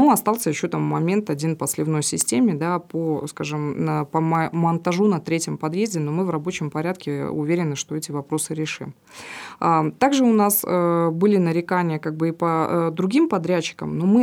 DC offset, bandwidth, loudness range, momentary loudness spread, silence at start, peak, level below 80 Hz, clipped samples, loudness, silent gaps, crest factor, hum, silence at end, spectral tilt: under 0.1%; over 20 kHz; 5 LU; 8 LU; 0 s; -4 dBFS; -66 dBFS; under 0.1%; -22 LUFS; none; 18 dB; none; 0 s; -5.5 dB/octave